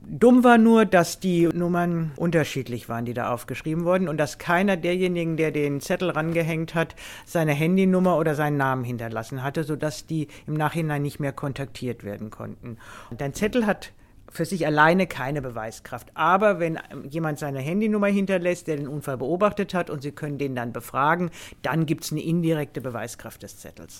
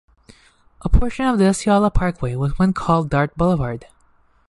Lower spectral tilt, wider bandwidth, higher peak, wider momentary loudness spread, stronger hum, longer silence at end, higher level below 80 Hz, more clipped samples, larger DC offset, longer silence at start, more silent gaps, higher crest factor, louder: about the same, -6.5 dB/octave vs -7 dB/octave; first, 16.5 kHz vs 11.5 kHz; about the same, -4 dBFS vs -2 dBFS; first, 15 LU vs 6 LU; neither; second, 0 s vs 0.65 s; second, -52 dBFS vs -28 dBFS; neither; neither; second, 0 s vs 0.85 s; neither; about the same, 20 dB vs 16 dB; second, -24 LUFS vs -19 LUFS